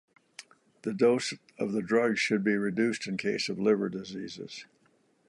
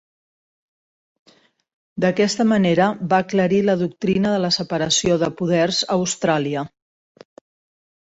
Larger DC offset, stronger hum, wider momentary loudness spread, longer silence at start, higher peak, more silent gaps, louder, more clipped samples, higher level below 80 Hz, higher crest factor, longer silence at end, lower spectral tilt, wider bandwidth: neither; neither; first, 18 LU vs 5 LU; second, 0.85 s vs 1.95 s; second, -12 dBFS vs -4 dBFS; neither; second, -29 LUFS vs -19 LUFS; neither; second, -72 dBFS vs -56 dBFS; about the same, 18 dB vs 18 dB; second, 0.65 s vs 1.45 s; about the same, -5 dB/octave vs -4.5 dB/octave; first, 11.5 kHz vs 8 kHz